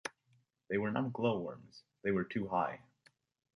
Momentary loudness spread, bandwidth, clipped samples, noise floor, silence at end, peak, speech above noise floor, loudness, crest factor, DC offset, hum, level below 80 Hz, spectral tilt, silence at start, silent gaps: 12 LU; 11 kHz; under 0.1%; -74 dBFS; 0.75 s; -18 dBFS; 38 dB; -37 LUFS; 20 dB; under 0.1%; none; -70 dBFS; -7 dB/octave; 0.05 s; none